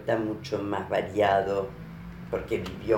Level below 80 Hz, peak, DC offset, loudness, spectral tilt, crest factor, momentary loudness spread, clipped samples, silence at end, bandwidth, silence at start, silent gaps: -50 dBFS; -10 dBFS; under 0.1%; -28 LUFS; -6.5 dB/octave; 18 dB; 16 LU; under 0.1%; 0 s; 17 kHz; 0 s; none